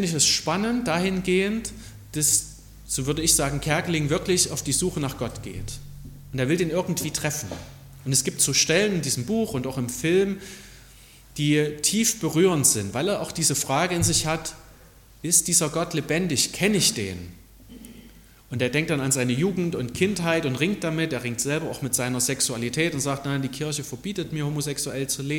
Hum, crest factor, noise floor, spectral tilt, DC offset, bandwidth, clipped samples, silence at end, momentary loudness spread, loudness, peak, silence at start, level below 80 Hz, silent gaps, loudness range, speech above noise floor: none; 20 dB; -50 dBFS; -3.5 dB/octave; under 0.1%; 17.5 kHz; under 0.1%; 0 s; 15 LU; -23 LUFS; -4 dBFS; 0 s; -48 dBFS; none; 4 LU; 26 dB